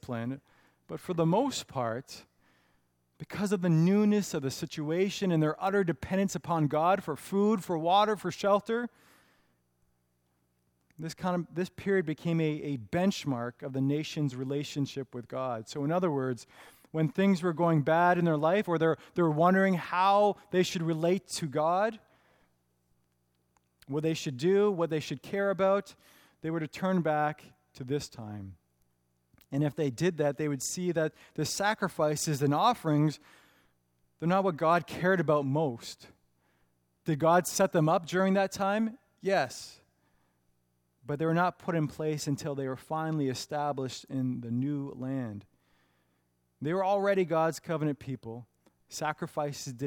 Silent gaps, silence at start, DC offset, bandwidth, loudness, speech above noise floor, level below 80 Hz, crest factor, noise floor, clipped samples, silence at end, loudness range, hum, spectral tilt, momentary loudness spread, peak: none; 0.05 s; under 0.1%; 18 kHz; -30 LUFS; 45 dB; -68 dBFS; 18 dB; -75 dBFS; under 0.1%; 0 s; 7 LU; 60 Hz at -60 dBFS; -6 dB/octave; 13 LU; -12 dBFS